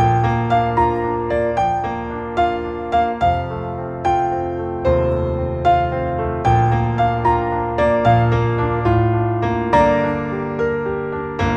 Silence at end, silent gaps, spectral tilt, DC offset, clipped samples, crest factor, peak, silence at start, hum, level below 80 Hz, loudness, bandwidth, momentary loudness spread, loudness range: 0 s; none; -8 dB/octave; under 0.1%; under 0.1%; 16 dB; -2 dBFS; 0 s; none; -32 dBFS; -18 LUFS; 7.2 kHz; 8 LU; 3 LU